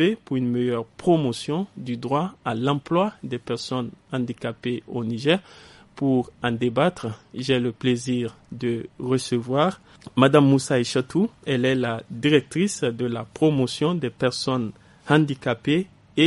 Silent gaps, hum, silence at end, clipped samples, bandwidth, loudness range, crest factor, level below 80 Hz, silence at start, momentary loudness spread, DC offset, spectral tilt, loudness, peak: none; none; 0 s; under 0.1%; 11.5 kHz; 5 LU; 22 dB; -60 dBFS; 0 s; 9 LU; under 0.1%; -6 dB/octave; -24 LUFS; -2 dBFS